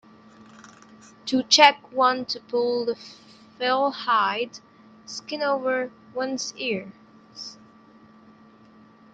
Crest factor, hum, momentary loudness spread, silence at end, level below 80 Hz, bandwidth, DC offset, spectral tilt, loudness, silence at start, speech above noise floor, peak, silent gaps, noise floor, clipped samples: 26 dB; none; 22 LU; 1.6 s; -74 dBFS; 9.2 kHz; under 0.1%; -2 dB/octave; -23 LUFS; 0.65 s; 29 dB; 0 dBFS; none; -52 dBFS; under 0.1%